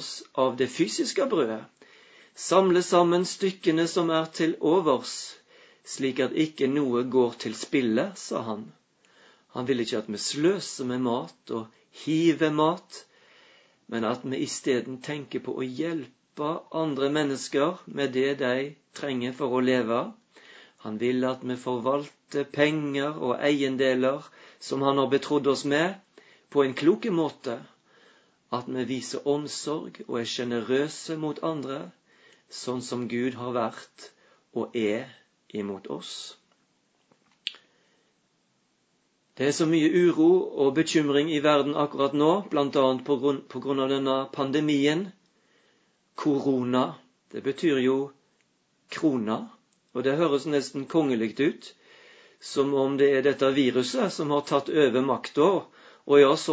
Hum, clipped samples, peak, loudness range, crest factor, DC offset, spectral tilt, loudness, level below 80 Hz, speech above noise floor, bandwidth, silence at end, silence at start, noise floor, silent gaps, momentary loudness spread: none; under 0.1%; -6 dBFS; 8 LU; 22 dB; under 0.1%; -5 dB/octave; -26 LUFS; -76 dBFS; 45 dB; 8 kHz; 0 s; 0 s; -70 dBFS; none; 13 LU